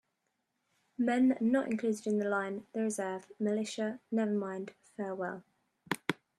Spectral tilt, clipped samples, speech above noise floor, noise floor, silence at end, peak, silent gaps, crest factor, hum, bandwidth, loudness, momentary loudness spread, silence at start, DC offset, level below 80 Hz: -5.5 dB/octave; under 0.1%; 49 dB; -82 dBFS; 0.25 s; -12 dBFS; none; 22 dB; none; 13 kHz; -34 LUFS; 12 LU; 1 s; under 0.1%; -80 dBFS